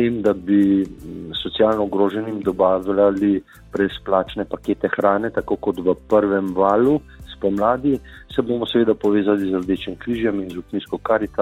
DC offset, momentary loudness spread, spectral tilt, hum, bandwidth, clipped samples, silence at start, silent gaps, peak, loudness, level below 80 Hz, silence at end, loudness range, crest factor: under 0.1%; 10 LU; -7.5 dB/octave; none; 8.4 kHz; under 0.1%; 0 s; none; -2 dBFS; -20 LUFS; -46 dBFS; 0 s; 2 LU; 18 dB